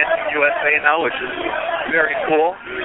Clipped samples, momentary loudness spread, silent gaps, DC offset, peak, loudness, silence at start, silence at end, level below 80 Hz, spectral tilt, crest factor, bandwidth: under 0.1%; 7 LU; none; under 0.1%; -2 dBFS; -18 LUFS; 0 s; 0 s; -52 dBFS; -8.5 dB/octave; 16 dB; 4.1 kHz